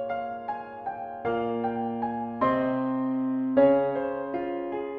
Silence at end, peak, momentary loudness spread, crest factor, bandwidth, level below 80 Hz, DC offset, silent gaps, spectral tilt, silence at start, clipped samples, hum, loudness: 0 s; -10 dBFS; 13 LU; 18 dB; 4.6 kHz; -62 dBFS; under 0.1%; none; -9.5 dB/octave; 0 s; under 0.1%; none; -28 LUFS